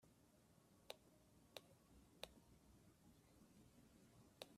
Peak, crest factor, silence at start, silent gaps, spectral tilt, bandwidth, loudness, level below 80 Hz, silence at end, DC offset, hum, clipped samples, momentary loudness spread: -32 dBFS; 36 dB; 0 s; none; -3.5 dB/octave; 14.5 kHz; -62 LUFS; -80 dBFS; 0 s; under 0.1%; none; under 0.1%; 2 LU